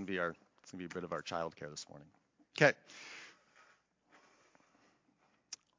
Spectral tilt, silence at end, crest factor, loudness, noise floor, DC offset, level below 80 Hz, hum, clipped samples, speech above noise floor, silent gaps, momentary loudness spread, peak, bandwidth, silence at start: -4.5 dB/octave; 0.25 s; 30 dB; -37 LUFS; -75 dBFS; under 0.1%; -76 dBFS; none; under 0.1%; 37 dB; none; 23 LU; -10 dBFS; 7.6 kHz; 0 s